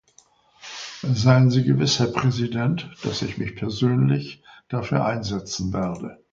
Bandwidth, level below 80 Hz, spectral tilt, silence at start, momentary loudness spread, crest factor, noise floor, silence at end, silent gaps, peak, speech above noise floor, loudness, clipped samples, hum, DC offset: 7.6 kHz; -50 dBFS; -6 dB/octave; 0.65 s; 15 LU; 20 dB; -58 dBFS; 0.2 s; none; -2 dBFS; 36 dB; -22 LUFS; under 0.1%; none; under 0.1%